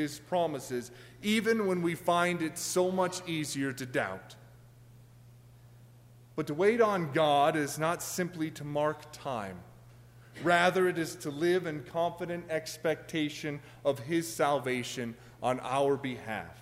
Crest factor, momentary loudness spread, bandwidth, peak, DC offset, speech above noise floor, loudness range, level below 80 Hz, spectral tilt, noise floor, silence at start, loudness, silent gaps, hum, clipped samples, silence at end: 20 dB; 12 LU; 16 kHz; -12 dBFS; under 0.1%; 25 dB; 5 LU; -66 dBFS; -4.5 dB/octave; -56 dBFS; 0 s; -31 LUFS; none; none; under 0.1%; 0 s